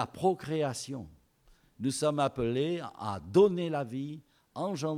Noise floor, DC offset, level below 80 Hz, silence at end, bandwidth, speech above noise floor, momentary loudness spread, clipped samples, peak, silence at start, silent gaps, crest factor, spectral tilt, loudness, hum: -64 dBFS; under 0.1%; -62 dBFS; 0 s; 15.5 kHz; 34 dB; 17 LU; under 0.1%; -14 dBFS; 0 s; none; 18 dB; -6 dB/octave; -31 LUFS; none